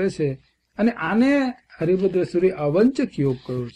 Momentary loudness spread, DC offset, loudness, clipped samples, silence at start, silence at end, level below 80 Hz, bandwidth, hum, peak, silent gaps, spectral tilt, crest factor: 9 LU; under 0.1%; -21 LUFS; under 0.1%; 0 s; 0.05 s; -54 dBFS; 10.5 kHz; none; -8 dBFS; none; -7.5 dB/octave; 14 dB